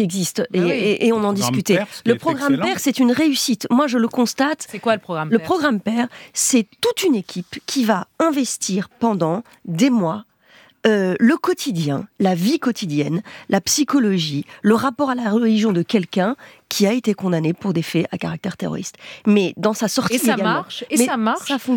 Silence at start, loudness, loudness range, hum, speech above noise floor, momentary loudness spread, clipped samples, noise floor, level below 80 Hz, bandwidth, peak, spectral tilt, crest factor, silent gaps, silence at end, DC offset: 0 s; -19 LUFS; 2 LU; none; 32 dB; 7 LU; under 0.1%; -51 dBFS; -64 dBFS; 19 kHz; -2 dBFS; -4.5 dB/octave; 18 dB; none; 0 s; under 0.1%